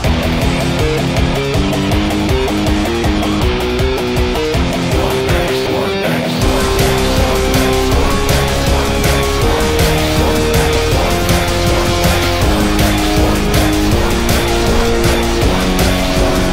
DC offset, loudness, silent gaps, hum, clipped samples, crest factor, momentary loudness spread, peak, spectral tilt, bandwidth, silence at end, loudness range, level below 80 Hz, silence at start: under 0.1%; -14 LUFS; none; none; under 0.1%; 10 dB; 2 LU; -2 dBFS; -5 dB/octave; 16.5 kHz; 0 s; 2 LU; -18 dBFS; 0 s